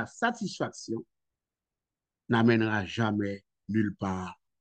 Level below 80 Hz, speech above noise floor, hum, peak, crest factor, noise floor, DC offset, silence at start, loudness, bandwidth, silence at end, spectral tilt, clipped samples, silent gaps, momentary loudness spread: -68 dBFS; over 61 dB; none; -10 dBFS; 20 dB; under -90 dBFS; under 0.1%; 0 s; -30 LUFS; 8.8 kHz; 0.25 s; -6 dB/octave; under 0.1%; none; 14 LU